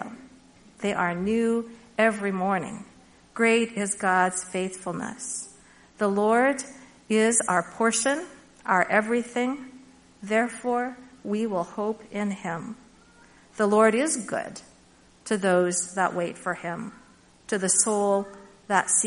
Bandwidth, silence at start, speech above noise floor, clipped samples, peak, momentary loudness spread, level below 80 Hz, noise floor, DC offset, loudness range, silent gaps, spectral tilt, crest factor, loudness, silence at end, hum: 11 kHz; 0 s; 31 dB; under 0.1%; -6 dBFS; 17 LU; -64 dBFS; -56 dBFS; under 0.1%; 5 LU; none; -3.5 dB/octave; 20 dB; -25 LUFS; 0 s; none